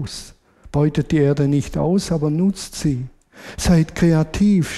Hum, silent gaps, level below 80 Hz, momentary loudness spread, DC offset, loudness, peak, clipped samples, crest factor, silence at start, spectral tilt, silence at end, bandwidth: none; none; -36 dBFS; 11 LU; under 0.1%; -19 LUFS; -4 dBFS; under 0.1%; 14 dB; 0 s; -6.5 dB/octave; 0 s; 13.5 kHz